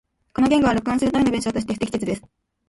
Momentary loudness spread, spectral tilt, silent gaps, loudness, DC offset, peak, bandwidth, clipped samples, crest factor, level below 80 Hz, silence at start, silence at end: 10 LU; -5.5 dB/octave; none; -21 LUFS; under 0.1%; -6 dBFS; 11.5 kHz; under 0.1%; 16 dB; -46 dBFS; 0.4 s; 0.5 s